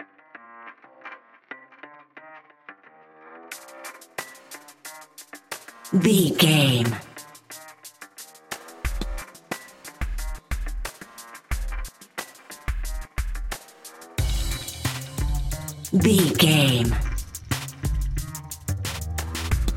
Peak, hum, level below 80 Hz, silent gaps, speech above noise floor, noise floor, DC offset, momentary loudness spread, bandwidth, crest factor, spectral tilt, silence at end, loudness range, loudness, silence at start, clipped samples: -4 dBFS; none; -34 dBFS; none; 33 dB; -52 dBFS; under 0.1%; 25 LU; 17 kHz; 22 dB; -4.5 dB/octave; 0 s; 19 LU; -25 LUFS; 0 s; under 0.1%